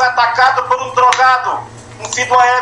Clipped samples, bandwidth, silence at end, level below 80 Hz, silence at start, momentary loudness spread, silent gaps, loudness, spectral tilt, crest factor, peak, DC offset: under 0.1%; 11 kHz; 0 s; -54 dBFS; 0 s; 14 LU; none; -12 LUFS; -1 dB/octave; 12 dB; 0 dBFS; under 0.1%